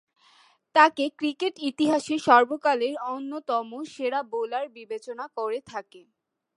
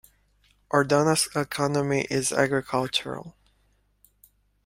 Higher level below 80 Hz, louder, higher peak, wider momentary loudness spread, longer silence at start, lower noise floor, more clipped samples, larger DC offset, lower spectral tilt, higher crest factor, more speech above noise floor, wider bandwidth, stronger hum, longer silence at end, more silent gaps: second, -76 dBFS vs -60 dBFS; about the same, -25 LUFS vs -24 LUFS; about the same, -4 dBFS vs -6 dBFS; first, 16 LU vs 6 LU; about the same, 0.75 s vs 0.7 s; second, -60 dBFS vs -66 dBFS; neither; neither; about the same, -3.5 dB/octave vs -4 dB/octave; about the same, 22 dB vs 22 dB; second, 35 dB vs 42 dB; second, 11.5 kHz vs 16 kHz; second, none vs 50 Hz at -55 dBFS; second, 0.6 s vs 1.35 s; neither